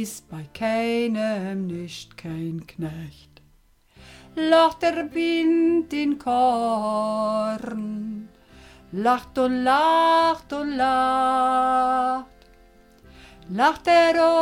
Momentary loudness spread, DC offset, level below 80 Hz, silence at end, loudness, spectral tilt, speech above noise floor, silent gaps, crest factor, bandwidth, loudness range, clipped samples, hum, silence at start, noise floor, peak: 16 LU; under 0.1%; -56 dBFS; 0 s; -22 LUFS; -5 dB/octave; 36 dB; none; 16 dB; 16 kHz; 7 LU; under 0.1%; none; 0 s; -58 dBFS; -8 dBFS